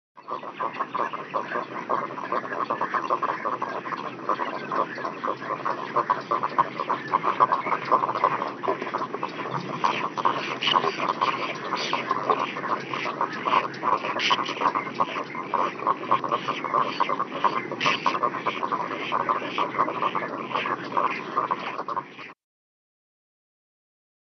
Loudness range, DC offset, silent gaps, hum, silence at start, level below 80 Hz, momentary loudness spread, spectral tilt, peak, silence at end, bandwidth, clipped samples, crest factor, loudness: 3 LU; under 0.1%; none; none; 0.15 s; under -90 dBFS; 7 LU; -1.5 dB/octave; -6 dBFS; 1.95 s; 6.4 kHz; under 0.1%; 20 dB; -26 LUFS